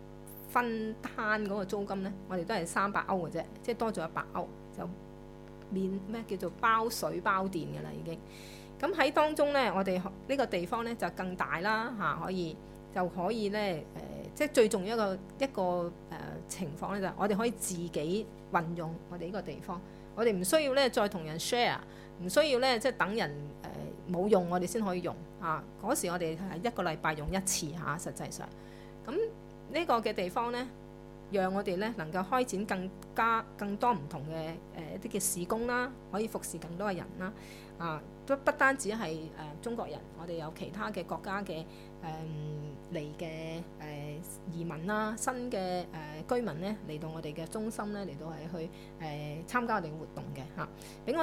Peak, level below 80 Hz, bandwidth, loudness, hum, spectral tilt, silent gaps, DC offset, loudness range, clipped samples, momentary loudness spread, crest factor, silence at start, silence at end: -10 dBFS; -56 dBFS; 16 kHz; -34 LUFS; 50 Hz at -55 dBFS; -4.5 dB/octave; none; under 0.1%; 7 LU; under 0.1%; 14 LU; 24 dB; 0 s; 0 s